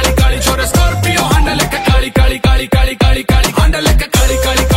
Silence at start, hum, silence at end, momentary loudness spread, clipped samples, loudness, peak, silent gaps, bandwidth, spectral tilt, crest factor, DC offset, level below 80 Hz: 0 s; none; 0 s; 2 LU; under 0.1%; -12 LUFS; 0 dBFS; none; 16.5 kHz; -4.5 dB/octave; 10 dB; under 0.1%; -14 dBFS